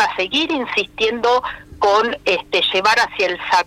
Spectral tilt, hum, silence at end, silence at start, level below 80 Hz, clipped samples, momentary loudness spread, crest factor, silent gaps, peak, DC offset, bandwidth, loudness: -2.5 dB/octave; 50 Hz at -50 dBFS; 0 s; 0 s; -50 dBFS; under 0.1%; 5 LU; 12 dB; none; -6 dBFS; under 0.1%; 16 kHz; -17 LUFS